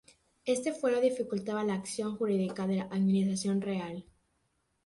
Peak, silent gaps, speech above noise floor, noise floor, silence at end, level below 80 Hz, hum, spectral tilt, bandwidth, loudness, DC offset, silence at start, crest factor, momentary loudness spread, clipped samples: -16 dBFS; none; 46 dB; -77 dBFS; 0.85 s; -70 dBFS; none; -6 dB/octave; 11.5 kHz; -32 LUFS; under 0.1%; 0.45 s; 16 dB; 8 LU; under 0.1%